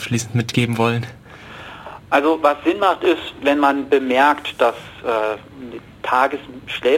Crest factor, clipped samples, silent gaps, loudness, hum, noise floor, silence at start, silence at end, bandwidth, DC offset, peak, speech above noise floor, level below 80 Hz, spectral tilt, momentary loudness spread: 16 dB; under 0.1%; none; -18 LUFS; none; -37 dBFS; 0 s; 0 s; 16.5 kHz; under 0.1%; -2 dBFS; 19 dB; -54 dBFS; -5.5 dB/octave; 19 LU